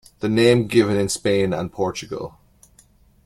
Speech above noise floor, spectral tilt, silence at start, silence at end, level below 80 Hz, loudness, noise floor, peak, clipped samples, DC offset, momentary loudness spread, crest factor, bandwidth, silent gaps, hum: 35 dB; -5.5 dB/octave; 0.2 s; 0.95 s; -52 dBFS; -20 LUFS; -54 dBFS; -4 dBFS; under 0.1%; under 0.1%; 15 LU; 18 dB; 14.5 kHz; none; none